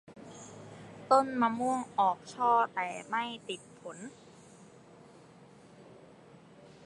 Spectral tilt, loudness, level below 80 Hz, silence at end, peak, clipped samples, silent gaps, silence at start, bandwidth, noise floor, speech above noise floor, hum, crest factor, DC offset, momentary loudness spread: -4.5 dB/octave; -31 LUFS; -78 dBFS; 0.2 s; -10 dBFS; under 0.1%; none; 0.1 s; 11.5 kHz; -56 dBFS; 25 dB; none; 24 dB; under 0.1%; 22 LU